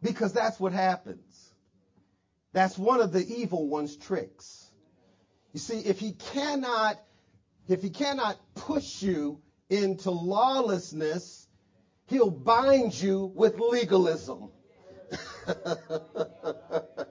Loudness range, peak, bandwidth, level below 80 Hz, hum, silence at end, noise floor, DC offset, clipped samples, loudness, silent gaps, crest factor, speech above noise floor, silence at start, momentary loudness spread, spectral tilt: 7 LU; -8 dBFS; 7.6 kHz; -66 dBFS; none; 0.05 s; -72 dBFS; under 0.1%; under 0.1%; -28 LUFS; none; 20 dB; 45 dB; 0 s; 16 LU; -5.5 dB/octave